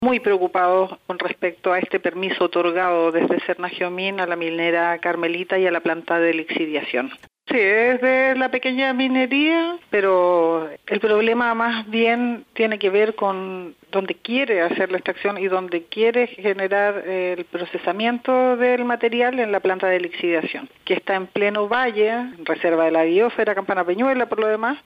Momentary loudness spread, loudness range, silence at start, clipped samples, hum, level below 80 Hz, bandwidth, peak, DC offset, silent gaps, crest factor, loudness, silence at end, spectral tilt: 8 LU; 3 LU; 0 s; under 0.1%; none; -68 dBFS; 5.4 kHz; -8 dBFS; under 0.1%; none; 12 dB; -20 LUFS; 0.05 s; -6.5 dB/octave